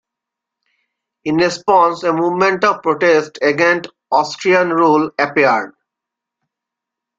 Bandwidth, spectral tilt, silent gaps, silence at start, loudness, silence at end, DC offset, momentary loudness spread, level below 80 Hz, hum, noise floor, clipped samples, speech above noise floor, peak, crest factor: 7.8 kHz; -5 dB/octave; none; 1.25 s; -15 LUFS; 1.5 s; under 0.1%; 6 LU; -60 dBFS; none; -83 dBFS; under 0.1%; 69 dB; -2 dBFS; 16 dB